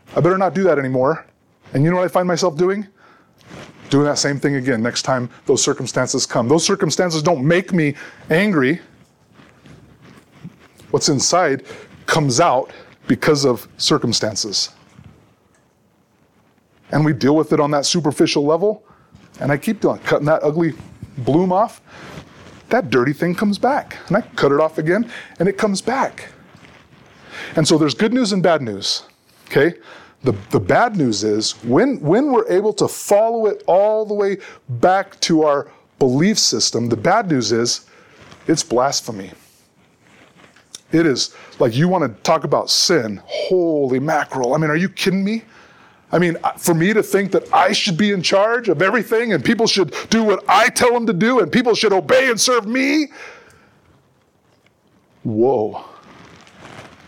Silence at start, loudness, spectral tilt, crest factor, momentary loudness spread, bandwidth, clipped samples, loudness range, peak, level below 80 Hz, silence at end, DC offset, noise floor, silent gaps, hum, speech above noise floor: 0.1 s; -17 LUFS; -4.5 dB/octave; 14 dB; 9 LU; 18.5 kHz; under 0.1%; 6 LU; -4 dBFS; -56 dBFS; 0.2 s; under 0.1%; -58 dBFS; none; none; 41 dB